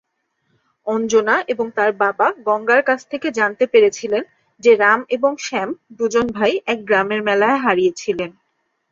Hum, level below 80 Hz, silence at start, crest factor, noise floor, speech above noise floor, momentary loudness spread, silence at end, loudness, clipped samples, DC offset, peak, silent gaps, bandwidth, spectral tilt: none; -60 dBFS; 0.85 s; 16 dB; -69 dBFS; 52 dB; 9 LU; 0.6 s; -17 LUFS; under 0.1%; under 0.1%; -2 dBFS; none; 7.6 kHz; -4 dB/octave